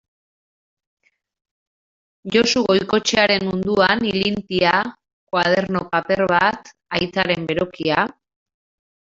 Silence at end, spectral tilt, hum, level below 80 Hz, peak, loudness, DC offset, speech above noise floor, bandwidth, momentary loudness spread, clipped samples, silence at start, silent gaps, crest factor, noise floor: 0.9 s; -4 dB/octave; none; -52 dBFS; -2 dBFS; -19 LUFS; under 0.1%; over 71 dB; 7.8 kHz; 7 LU; under 0.1%; 2.25 s; 5.13-5.27 s; 18 dB; under -90 dBFS